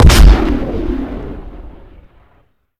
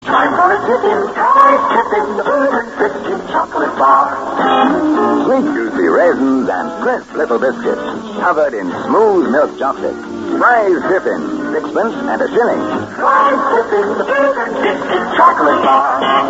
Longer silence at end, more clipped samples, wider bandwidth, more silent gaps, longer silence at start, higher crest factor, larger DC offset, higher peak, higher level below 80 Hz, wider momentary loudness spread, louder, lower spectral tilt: first, 1.1 s vs 0 s; first, 2% vs under 0.1%; first, 15.5 kHz vs 8 kHz; neither; about the same, 0 s vs 0 s; about the same, 12 dB vs 14 dB; neither; about the same, 0 dBFS vs 0 dBFS; first, -14 dBFS vs -52 dBFS; first, 25 LU vs 8 LU; about the same, -13 LUFS vs -13 LUFS; about the same, -5.5 dB/octave vs -5.5 dB/octave